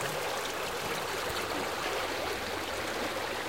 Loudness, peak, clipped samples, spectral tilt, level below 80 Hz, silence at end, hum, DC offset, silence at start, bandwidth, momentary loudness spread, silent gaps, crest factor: -33 LUFS; -18 dBFS; under 0.1%; -2.5 dB/octave; -56 dBFS; 0 s; none; 0.2%; 0 s; 17 kHz; 1 LU; none; 16 dB